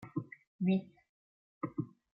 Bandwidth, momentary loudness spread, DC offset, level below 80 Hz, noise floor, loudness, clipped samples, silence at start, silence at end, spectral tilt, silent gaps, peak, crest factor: 4.1 kHz; 11 LU; under 0.1%; -78 dBFS; under -90 dBFS; -38 LUFS; under 0.1%; 0 s; 0.25 s; -10 dB/octave; 0.47-0.59 s, 1.09-1.61 s; -22 dBFS; 18 dB